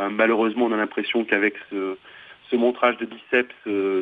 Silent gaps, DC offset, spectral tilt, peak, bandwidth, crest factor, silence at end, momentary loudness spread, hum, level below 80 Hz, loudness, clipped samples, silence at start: none; under 0.1%; -7 dB/octave; -4 dBFS; 4.8 kHz; 20 dB; 0 s; 10 LU; none; -72 dBFS; -23 LUFS; under 0.1%; 0 s